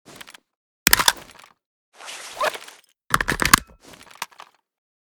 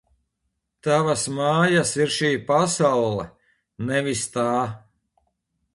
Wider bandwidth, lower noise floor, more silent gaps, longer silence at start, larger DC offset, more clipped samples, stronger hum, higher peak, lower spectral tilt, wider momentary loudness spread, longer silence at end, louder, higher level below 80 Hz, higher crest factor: first, over 20 kHz vs 11.5 kHz; second, -49 dBFS vs -77 dBFS; first, 1.66-1.92 s vs none; about the same, 0.85 s vs 0.85 s; neither; neither; neither; first, 0 dBFS vs -6 dBFS; second, -1 dB/octave vs -4.5 dB/octave; first, 22 LU vs 12 LU; second, 0.75 s vs 0.95 s; first, -19 LUFS vs -22 LUFS; first, -44 dBFS vs -58 dBFS; first, 26 dB vs 18 dB